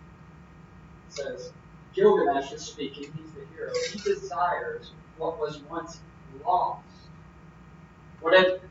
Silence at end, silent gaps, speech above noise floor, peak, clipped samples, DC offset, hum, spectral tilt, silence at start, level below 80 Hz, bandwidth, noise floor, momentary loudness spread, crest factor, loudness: 0 s; none; 23 dB; -6 dBFS; under 0.1%; under 0.1%; none; -4.5 dB/octave; 0 s; -58 dBFS; 7.8 kHz; -50 dBFS; 21 LU; 22 dB; -27 LUFS